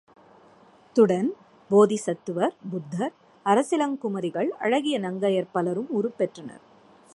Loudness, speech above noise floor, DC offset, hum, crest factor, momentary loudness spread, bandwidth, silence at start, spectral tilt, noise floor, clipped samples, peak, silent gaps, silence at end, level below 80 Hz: -25 LUFS; 31 dB; under 0.1%; none; 20 dB; 12 LU; 11.5 kHz; 0.95 s; -6 dB/octave; -55 dBFS; under 0.1%; -6 dBFS; none; 0.65 s; -76 dBFS